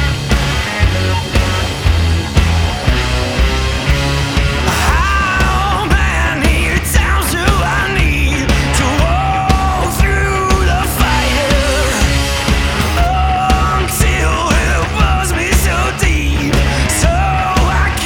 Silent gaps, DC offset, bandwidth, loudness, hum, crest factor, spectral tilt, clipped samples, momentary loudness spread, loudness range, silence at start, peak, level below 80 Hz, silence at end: none; under 0.1%; 17.5 kHz; -13 LUFS; none; 12 dB; -4.5 dB/octave; under 0.1%; 2 LU; 1 LU; 0 s; 0 dBFS; -16 dBFS; 0 s